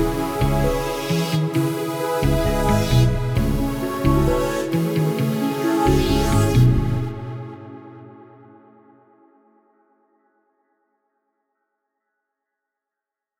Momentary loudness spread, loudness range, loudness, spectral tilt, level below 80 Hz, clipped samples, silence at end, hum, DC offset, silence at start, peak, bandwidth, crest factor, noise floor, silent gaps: 12 LU; 6 LU; -20 LUFS; -6.5 dB/octave; -30 dBFS; under 0.1%; 5.15 s; none; under 0.1%; 0 s; -4 dBFS; 18.5 kHz; 16 dB; -86 dBFS; none